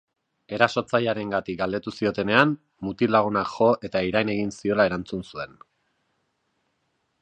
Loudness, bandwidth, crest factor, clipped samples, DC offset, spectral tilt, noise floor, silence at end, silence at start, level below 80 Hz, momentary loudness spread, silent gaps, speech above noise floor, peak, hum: -24 LUFS; 9.2 kHz; 24 dB; under 0.1%; under 0.1%; -6 dB/octave; -73 dBFS; 1.75 s; 0.5 s; -56 dBFS; 13 LU; none; 50 dB; -2 dBFS; none